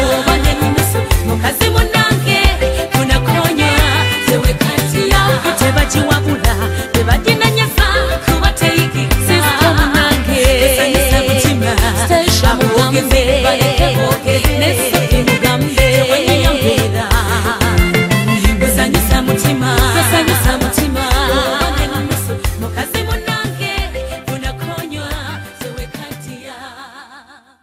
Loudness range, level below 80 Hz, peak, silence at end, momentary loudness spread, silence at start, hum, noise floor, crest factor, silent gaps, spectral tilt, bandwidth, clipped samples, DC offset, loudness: 8 LU; -20 dBFS; 0 dBFS; 0.45 s; 11 LU; 0 s; none; -41 dBFS; 12 dB; none; -4.5 dB/octave; 16.5 kHz; under 0.1%; under 0.1%; -13 LUFS